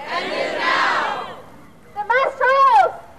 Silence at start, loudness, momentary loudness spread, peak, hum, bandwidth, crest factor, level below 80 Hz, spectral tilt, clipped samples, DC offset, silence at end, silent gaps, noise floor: 0 s; -17 LUFS; 17 LU; -6 dBFS; none; 13 kHz; 14 dB; -58 dBFS; -2.5 dB/octave; under 0.1%; 0.5%; 0.2 s; none; -45 dBFS